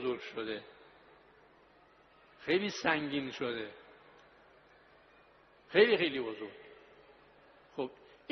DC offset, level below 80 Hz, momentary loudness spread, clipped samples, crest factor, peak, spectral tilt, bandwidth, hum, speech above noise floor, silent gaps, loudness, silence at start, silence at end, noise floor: under 0.1%; -74 dBFS; 26 LU; under 0.1%; 26 dB; -12 dBFS; -2.5 dB/octave; 6.2 kHz; none; 31 dB; none; -33 LUFS; 0 s; 0.35 s; -63 dBFS